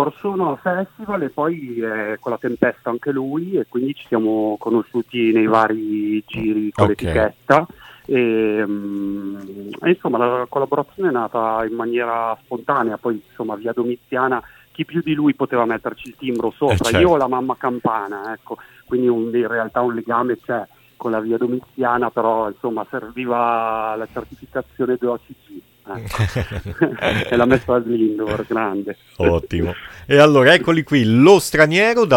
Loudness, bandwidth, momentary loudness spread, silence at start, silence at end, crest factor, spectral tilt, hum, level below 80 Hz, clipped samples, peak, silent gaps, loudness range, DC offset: -19 LUFS; 17 kHz; 13 LU; 0 s; 0 s; 18 dB; -6 dB/octave; none; -44 dBFS; under 0.1%; 0 dBFS; none; 6 LU; under 0.1%